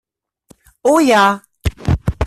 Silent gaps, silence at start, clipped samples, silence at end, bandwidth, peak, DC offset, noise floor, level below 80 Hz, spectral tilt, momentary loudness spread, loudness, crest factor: none; 0.85 s; under 0.1%; 0 s; 14.5 kHz; -2 dBFS; under 0.1%; -51 dBFS; -30 dBFS; -5.5 dB/octave; 11 LU; -15 LUFS; 14 dB